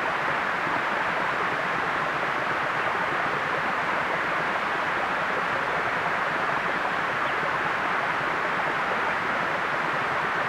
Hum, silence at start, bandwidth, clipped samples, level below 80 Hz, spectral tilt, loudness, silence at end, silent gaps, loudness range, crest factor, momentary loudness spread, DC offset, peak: none; 0 s; 16.5 kHz; under 0.1%; -58 dBFS; -4 dB/octave; -25 LUFS; 0 s; none; 0 LU; 14 dB; 1 LU; under 0.1%; -12 dBFS